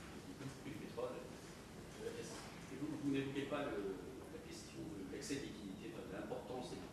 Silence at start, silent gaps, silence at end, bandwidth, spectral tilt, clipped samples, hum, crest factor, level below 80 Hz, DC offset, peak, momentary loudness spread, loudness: 0 s; none; 0 s; 14 kHz; -5 dB/octave; under 0.1%; none; 20 dB; -66 dBFS; under 0.1%; -28 dBFS; 11 LU; -47 LUFS